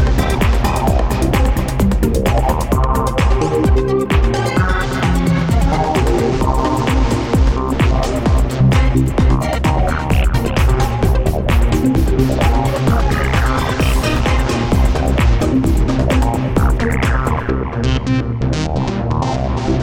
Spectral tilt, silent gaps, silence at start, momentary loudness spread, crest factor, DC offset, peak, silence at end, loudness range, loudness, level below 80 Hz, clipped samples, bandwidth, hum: -6.5 dB/octave; none; 0 s; 3 LU; 12 dB; under 0.1%; -2 dBFS; 0 s; 1 LU; -16 LUFS; -18 dBFS; under 0.1%; 16.5 kHz; none